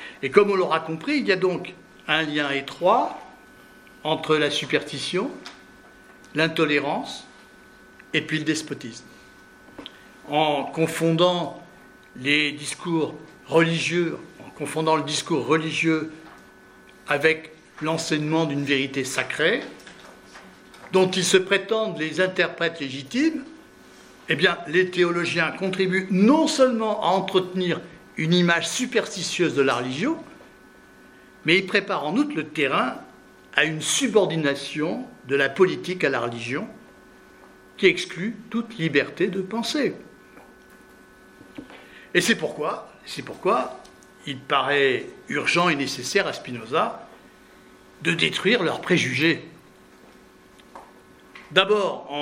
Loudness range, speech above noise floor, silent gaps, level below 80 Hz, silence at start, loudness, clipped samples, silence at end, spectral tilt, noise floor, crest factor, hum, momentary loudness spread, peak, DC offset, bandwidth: 5 LU; 28 dB; none; -64 dBFS; 0 s; -23 LUFS; under 0.1%; 0 s; -4 dB/octave; -51 dBFS; 24 dB; none; 15 LU; 0 dBFS; under 0.1%; 16 kHz